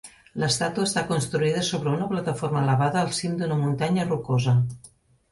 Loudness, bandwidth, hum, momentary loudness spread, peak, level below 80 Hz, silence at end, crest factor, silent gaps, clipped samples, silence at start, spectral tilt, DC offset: -24 LUFS; 11.5 kHz; none; 5 LU; -10 dBFS; -56 dBFS; 0.45 s; 14 dB; none; under 0.1%; 0.05 s; -5.5 dB/octave; under 0.1%